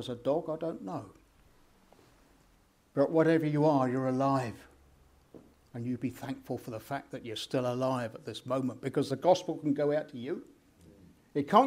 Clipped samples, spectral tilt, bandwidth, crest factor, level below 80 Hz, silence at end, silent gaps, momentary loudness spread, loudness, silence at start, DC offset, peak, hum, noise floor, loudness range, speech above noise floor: under 0.1%; -7 dB/octave; 16 kHz; 24 dB; -68 dBFS; 0 s; none; 14 LU; -32 LUFS; 0 s; under 0.1%; -8 dBFS; none; -66 dBFS; 6 LU; 35 dB